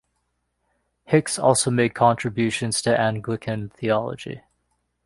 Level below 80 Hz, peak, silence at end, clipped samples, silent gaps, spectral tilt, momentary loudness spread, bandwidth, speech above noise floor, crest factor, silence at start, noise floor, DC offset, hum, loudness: -58 dBFS; -2 dBFS; 0.7 s; under 0.1%; none; -4.5 dB/octave; 12 LU; 11.5 kHz; 52 dB; 20 dB; 1.1 s; -73 dBFS; under 0.1%; 60 Hz at -45 dBFS; -22 LUFS